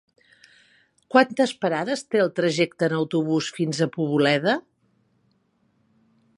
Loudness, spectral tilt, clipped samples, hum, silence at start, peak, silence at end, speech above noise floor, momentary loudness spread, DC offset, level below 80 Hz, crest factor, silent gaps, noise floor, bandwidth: -23 LUFS; -5.5 dB/octave; under 0.1%; none; 1.1 s; -2 dBFS; 1.75 s; 45 dB; 5 LU; under 0.1%; -74 dBFS; 22 dB; none; -67 dBFS; 11.5 kHz